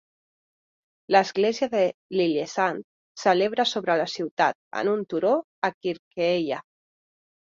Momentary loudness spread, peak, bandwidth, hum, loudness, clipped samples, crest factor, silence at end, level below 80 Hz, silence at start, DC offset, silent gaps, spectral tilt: 8 LU; -4 dBFS; 7.8 kHz; none; -25 LUFS; under 0.1%; 22 dB; 0.85 s; -72 dBFS; 1.1 s; under 0.1%; 1.94-2.10 s, 2.84-3.15 s, 4.31-4.37 s, 4.55-4.71 s, 5.44-5.62 s, 5.74-5.81 s, 5.99-6.11 s; -4.5 dB/octave